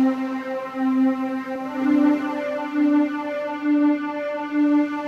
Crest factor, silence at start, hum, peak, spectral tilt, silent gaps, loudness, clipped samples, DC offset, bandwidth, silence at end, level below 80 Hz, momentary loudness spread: 12 dB; 0 s; none; -10 dBFS; -6 dB/octave; none; -22 LUFS; under 0.1%; under 0.1%; 6.6 kHz; 0 s; -70 dBFS; 8 LU